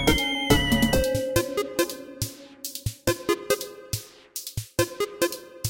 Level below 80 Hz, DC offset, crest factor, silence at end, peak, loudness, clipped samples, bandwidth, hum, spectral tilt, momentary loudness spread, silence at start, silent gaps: -38 dBFS; under 0.1%; 20 dB; 0 s; -6 dBFS; -26 LUFS; under 0.1%; 17 kHz; none; -4 dB/octave; 12 LU; 0 s; none